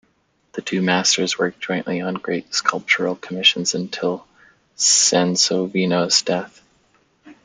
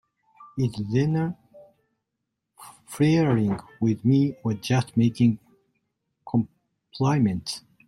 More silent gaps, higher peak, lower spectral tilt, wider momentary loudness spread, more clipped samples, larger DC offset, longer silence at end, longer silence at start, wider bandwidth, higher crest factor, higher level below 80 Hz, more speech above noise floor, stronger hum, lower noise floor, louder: neither; first, -2 dBFS vs -10 dBFS; second, -2.5 dB/octave vs -7 dB/octave; second, 10 LU vs 14 LU; neither; neither; second, 0.1 s vs 0.3 s; first, 0.55 s vs 0.4 s; second, 11 kHz vs 13 kHz; about the same, 20 dB vs 16 dB; second, -66 dBFS vs -58 dBFS; second, 44 dB vs 59 dB; neither; second, -64 dBFS vs -82 dBFS; first, -18 LUFS vs -24 LUFS